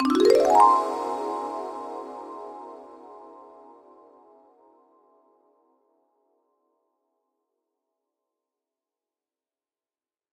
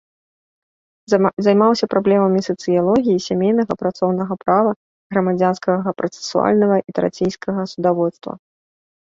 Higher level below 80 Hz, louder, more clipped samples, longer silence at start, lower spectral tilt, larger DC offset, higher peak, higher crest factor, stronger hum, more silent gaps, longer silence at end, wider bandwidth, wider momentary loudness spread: second, -68 dBFS vs -58 dBFS; second, -22 LUFS vs -18 LUFS; neither; second, 0 s vs 1.1 s; second, -3.5 dB/octave vs -6.5 dB/octave; neither; about the same, -4 dBFS vs -2 dBFS; first, 24 dB vs 16 dB; neither; second, none vs 1.33-1.37 s, 4.76-5.10 s; first, 7.05 s vs 0.8 s; first, 16 kHz vs 7.8 kHz; first, 29 LU vs 8 LU